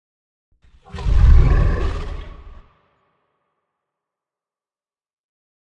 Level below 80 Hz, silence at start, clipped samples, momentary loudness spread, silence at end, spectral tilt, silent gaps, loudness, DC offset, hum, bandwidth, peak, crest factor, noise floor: -20 dBFS; 0.95 s; under 0.1%; 22 LU; 3.3 s; -8 dB/octave; none; -18 LUFS; under 0.1%; none; 6.4 kHz; 0 dBFS; 20 dB; under -90 dBFS